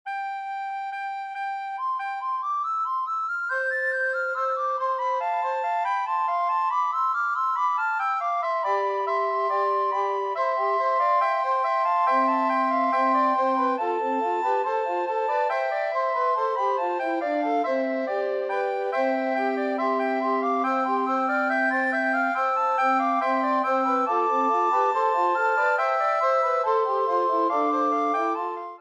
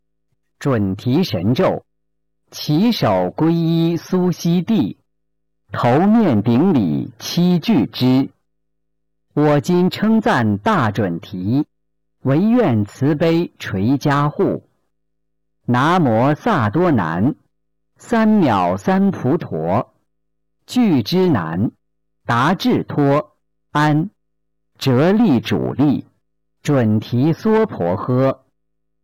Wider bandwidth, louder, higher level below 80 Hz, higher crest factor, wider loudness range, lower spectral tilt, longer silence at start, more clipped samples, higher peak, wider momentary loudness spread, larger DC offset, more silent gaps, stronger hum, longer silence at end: second, 9.4 kHz vs 17 kHz; second, -24 LUFS vs -17 LUFS; second, -84 dBFS vs -54 dBFS; first, 14 dB vs 8 dB; about the same, 3 LU vs 2 LU; second, -3.5 dB/octave vs -7.5 dB/octave; second, 0.05 s vs 0.6 s; neither; about the same, -10 dBFS vs -8 dBFS; second, 5 LU vs 9 LU; neither; neither; neither; second, 0 s vs 0.7 s